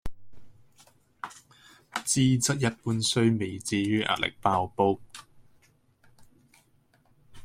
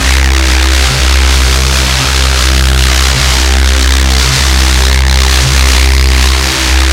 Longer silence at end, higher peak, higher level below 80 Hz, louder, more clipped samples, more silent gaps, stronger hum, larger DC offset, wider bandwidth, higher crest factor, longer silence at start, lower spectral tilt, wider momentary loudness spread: about the same, 0 s vs 0 s; second, -8 dBFS vs 0 dBFS; second, -56 dBFS vs -8 dBFS; second, -26 LUFS vs -8 LUFS; second, under 0.1% vs 0.4%; neither; neither; neither; about the same, 16 kHz vs 16.5 kHz; first, 20 dB vs 8 dB; about the same, 0.05 s vs 0 s; first, -4.5 dB/octave vs -3 dB/octave; first, 19 LU vs 1 LU